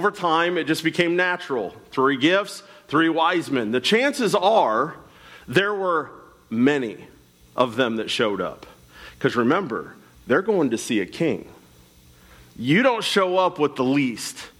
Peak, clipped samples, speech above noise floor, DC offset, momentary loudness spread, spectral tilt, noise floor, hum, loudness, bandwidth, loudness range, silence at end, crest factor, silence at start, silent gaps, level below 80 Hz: -6 dBFS; under 0.1%; 30 dB; under 0.1%; 12 LU; -4.5 dB/octave; -52 dBFS; none; -22 LUFS; 16 kHz; 4 LU; 0.1 s; 16 dB; 0 s; none; -60 dBFS